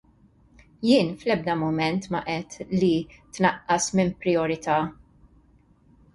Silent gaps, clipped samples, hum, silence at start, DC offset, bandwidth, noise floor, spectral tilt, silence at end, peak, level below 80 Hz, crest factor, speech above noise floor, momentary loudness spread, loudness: none; under 0.1%; none; 0.8 s; under 0.1%; 11.5 kHz; -58 dBFS; -5 dB/octave; 1.2 s; -6 dBFS; -56 dBFS; 20 dB; 34 dB; 8 LU; -24 LUFS